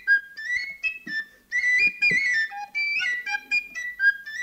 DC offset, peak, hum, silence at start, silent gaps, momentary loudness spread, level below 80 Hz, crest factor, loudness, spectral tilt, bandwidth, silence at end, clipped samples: under 0.1%; -12 dBFS; none; 0 s; none; 10 LU; -64 dBFS; 14 dB; -23 LUFS; -0.5 dB/octave; 16 kHz; 0 s; under 0.1%